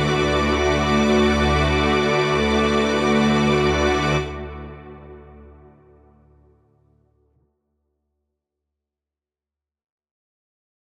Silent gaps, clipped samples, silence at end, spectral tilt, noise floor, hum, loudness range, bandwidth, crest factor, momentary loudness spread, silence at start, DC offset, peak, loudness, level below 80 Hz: none; under 0.1%; 5.5 s; -5.5 dB/octave; -90 dBFS; none; 12 LU; 12.5 kHz; 16 dB; 16 LU; 0 s; under 0.1%; -6 dBFS; -19 LUFS; -34 dBFS